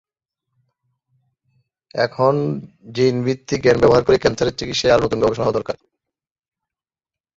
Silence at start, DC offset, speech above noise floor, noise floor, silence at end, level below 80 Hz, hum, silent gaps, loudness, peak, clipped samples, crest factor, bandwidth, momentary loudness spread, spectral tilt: 1.95 s; under 0.1%; over 73 dB; under -90 dBFS; 1.65 s; -46 dBFS; none; none; -18 LUFS; -2 dBFS; under 0.1%; 18 dB; 7.8 kHz; 15 LU; -5.5 dB/octave